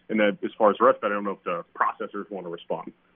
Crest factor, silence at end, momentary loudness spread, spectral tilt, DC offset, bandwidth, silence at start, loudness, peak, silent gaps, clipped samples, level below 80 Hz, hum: 20 dB; 0.25 s; 14 LU; -3.5 dB/octave; under 0.1%; 3.7 kHz; 0.1 s; -25 LUFS; -6 dBFS; none; under 0.1%; -76 dBFS; none